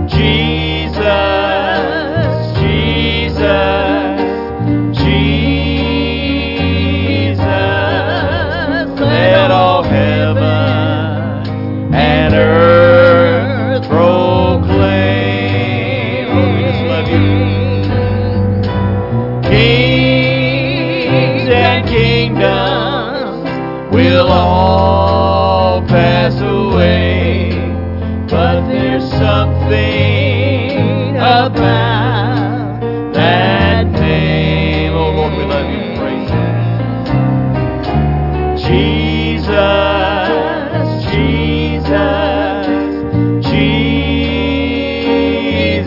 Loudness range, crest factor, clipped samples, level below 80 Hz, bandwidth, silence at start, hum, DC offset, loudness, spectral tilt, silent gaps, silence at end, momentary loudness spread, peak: 4 LU; 12 dB; under 0.1%; -28 dBFS; 5.8 kHz; 0 s; none; under 0.1%; -12 LUFS; -8.5 dB/octave; none; 0 s; 6 LU; 0 dBFS